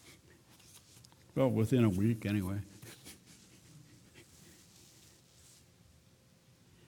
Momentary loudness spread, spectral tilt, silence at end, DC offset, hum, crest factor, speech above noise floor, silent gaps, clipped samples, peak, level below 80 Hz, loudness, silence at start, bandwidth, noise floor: 29 LU; -7.5 dB/octave; 2.65 s; under 0.1%; none; 20 dB; 34 dB; none; under 0.1%; -16 dBFS; -68 dBFS; -32 LUFS; 0.1 s; 18 kHz; -65 dBFS